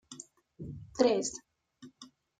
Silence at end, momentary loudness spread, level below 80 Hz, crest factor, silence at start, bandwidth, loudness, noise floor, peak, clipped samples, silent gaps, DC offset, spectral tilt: 0.35 s; 24 LU; -66 dBFS; 24 dB; 0.1 s; 9.6 kHz; -31 LUFS; -58 dBFS; -12 dBFS; under 0.1%; none; under 0.1%; -4 dB/octave